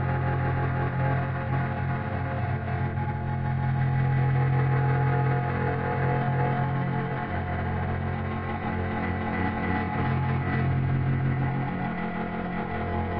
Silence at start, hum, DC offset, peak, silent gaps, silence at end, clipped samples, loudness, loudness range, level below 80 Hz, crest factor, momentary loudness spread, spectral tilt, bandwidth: 0 s; none; under 0.1%; -14 dBFS; none; 0 s; under 0.1%; -27 LUFS; 3 LU; -48 dBFS; 12 dB; 6 LU; -7.5 dB/octave; 4.7 kHz